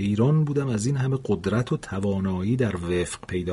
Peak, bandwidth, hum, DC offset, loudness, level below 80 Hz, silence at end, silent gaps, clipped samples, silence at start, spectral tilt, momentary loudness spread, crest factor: -10 dBFS; 11.5 kHz; none; under 0.1%; -25 LUFS; -48 dBFS; 0 s; none; under 0.1%; 0 s; -7 dB/octave; 6 LU; 14 dB